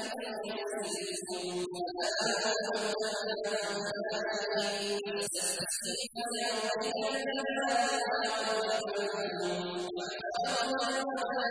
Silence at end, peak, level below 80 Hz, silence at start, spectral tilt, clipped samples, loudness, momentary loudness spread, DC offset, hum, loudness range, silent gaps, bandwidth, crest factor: 0 s; -18 dBFS; -74 dBFS; 0 s; -2 dB/octave; under 0.1%; -33 LUFS; 6 LU; under 0.1%; none; 1 LU; none; 11 kHz; 16 dB